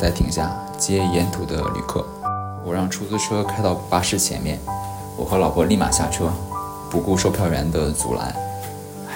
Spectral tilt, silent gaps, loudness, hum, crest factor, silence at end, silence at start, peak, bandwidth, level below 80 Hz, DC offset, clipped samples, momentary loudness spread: -4.5 dB/octave; none; -22 LUFS; none; 18 dB; 0 s; 0 s; -4 dBFS; 16.5 kHz; -34 dBFS; under 0.1%; under 0.1%; 10 LU